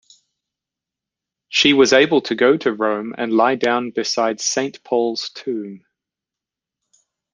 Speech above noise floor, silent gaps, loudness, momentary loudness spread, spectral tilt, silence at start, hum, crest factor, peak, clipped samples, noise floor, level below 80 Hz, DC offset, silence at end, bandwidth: 69 dB; none; -18 LUFS; 13 LU; -3 dB/octave; 1.5 s; none; 18 dB; -2 dBFS; under 0.1%; -87 dBFS; -66 dBFS; under 0.1%; 1.55 s; 10 kHz